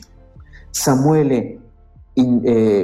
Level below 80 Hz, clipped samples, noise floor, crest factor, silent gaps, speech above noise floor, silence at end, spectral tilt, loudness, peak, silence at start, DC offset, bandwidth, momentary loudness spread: -44 dBFS; under 0.1%; -45 dBFS; 10 dB; none; 31 dB; 0 s; -6 dB/octave; -17 LUFS; -6 dBFS; 0.4 s; under 0.1%; 16 kHz; 10 LU